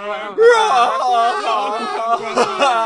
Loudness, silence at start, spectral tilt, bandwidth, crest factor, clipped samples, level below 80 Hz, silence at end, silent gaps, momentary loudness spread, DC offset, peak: -15 LUFS; 0 s; -2 dB/octave; 11.5 kHz; 14 dB; under 0.1%; -64 dBFS; 0 s; none; 9 LU; under 0.1%; -2 dBFS